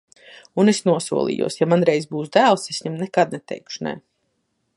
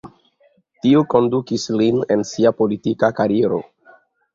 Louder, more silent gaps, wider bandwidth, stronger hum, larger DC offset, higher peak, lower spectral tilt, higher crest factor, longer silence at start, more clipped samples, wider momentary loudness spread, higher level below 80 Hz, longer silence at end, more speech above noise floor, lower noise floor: about the same, -20 LUFS vs -18 LUFS; neither; first, 11.5 kHz vs 7.8 kHz; neither; neither; about the same, -2 dBFS vs -2 dBFS; second, -5 dB/octave vs -6.5 dB/octave; about the same, 18 dB vs 16 dB; first, 0.3 s vs 0.05 s; neither; first, 13 LU vs 6 LU; second, -66 dBFS vs -58 dBFS; about the same, 0.75 s vs 0.7 s; first, 52 dB vs 42 dB; first, -71 dBFS vs -59 dBFS